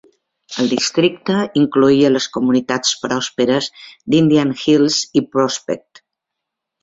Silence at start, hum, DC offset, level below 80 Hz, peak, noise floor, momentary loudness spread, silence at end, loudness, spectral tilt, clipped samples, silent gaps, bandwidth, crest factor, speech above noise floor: 0.5 s; none; under 0.1%; -56 dBFS; -2 dBFS; -80 dBFS; 9 LU; 1.05 s; -16 LUFS; -4.5 dB/octave; under 0.1%; none; 8 kHz; 16 dB; 65 dB